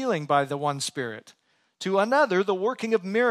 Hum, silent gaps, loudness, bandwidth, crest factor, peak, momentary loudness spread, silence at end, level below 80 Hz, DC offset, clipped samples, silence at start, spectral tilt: none; none; -25 LUFS; 14 kHz; 16 dB; -8 dBFS; 12 LU; 0 s; -80 dBFS; under 0.1%; under 0.1%; 0 s; -4.5 dB/octave